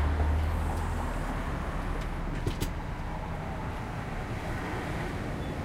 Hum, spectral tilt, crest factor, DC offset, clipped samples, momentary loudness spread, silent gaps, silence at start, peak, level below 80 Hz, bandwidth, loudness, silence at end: none; -6.5 dB/octave; 14 dB; under 0.1%; under 0.1%; 7 LU; none; 0 s; -16 dBFS; -34 dBFS; 16 kHz; -34 LUFS; 0 s